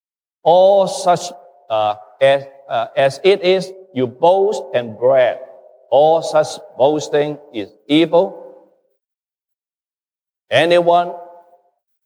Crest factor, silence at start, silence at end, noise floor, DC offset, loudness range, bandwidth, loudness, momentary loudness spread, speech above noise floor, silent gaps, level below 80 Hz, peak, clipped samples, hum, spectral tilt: 16 dB; 0.45 s; 0.8 s; under -90 dBFS; under 0.1%; 4 LU; 12 kHz; -16 LUFS; 11 LU; over 75 dB; none; -74 dBFS; -2 dBFS; under 0.1%; none; -5 dB/octave